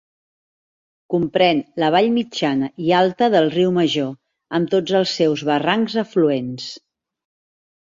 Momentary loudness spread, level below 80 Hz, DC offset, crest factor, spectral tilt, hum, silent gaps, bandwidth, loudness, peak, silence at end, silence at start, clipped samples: 8 LU; -62 dBFS; under 0.1%; 18 dB; -6 dB/octave; none; none; 7.6 kHz; -19 LUFS; -2 dBFS; 1.05 s; 1.1 s; under 0.1%